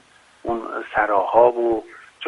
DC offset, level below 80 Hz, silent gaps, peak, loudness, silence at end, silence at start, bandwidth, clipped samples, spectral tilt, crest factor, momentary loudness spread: under 0.1%; -54 dBFS; none; 0 dBFS; -20 LUFS; 0 s; 0.45 s; 10.5 kHz; under 0.1%; -6 dB/octave; 20 dB; 12 LU